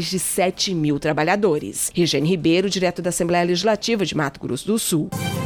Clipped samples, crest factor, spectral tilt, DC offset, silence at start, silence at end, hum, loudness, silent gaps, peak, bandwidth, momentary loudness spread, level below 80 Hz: under 0.1%; 14 dB; -4 dB/octave; under 0.1%; 0 s; 0 s; none; -20 LUFS; none; -6 dBFS; 19 kHz; 5 LU; -50 dBFS